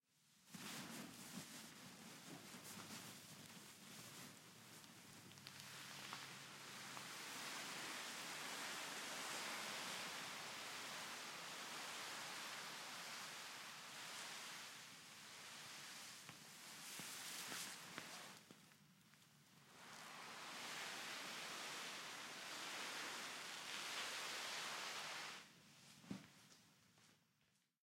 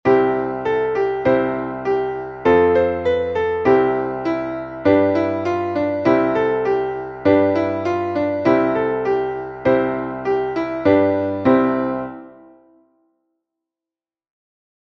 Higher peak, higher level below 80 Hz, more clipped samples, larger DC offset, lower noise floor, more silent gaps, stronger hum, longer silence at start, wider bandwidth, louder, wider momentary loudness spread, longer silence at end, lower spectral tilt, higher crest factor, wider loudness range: second, -30 dBFS vs -2 dBFS; second, under -90 dBFS vs -50 dBFS; neither; neither; second, -82 dBFS vs under -90 dBFS; neither; neither; about the same, 0.15 s vs 0.05 s; first, 16.5 kHz vs 6.6 kHz; second, -51 LUFS vs -19 LUFS; first, 13 LU vs 7 LU; second, 0.65 s vs 2.6 s; second, -1 dB/octave vs -8 dB/octave; first, 24 dB vs 16 dB; first, 8 LU vs 3 LU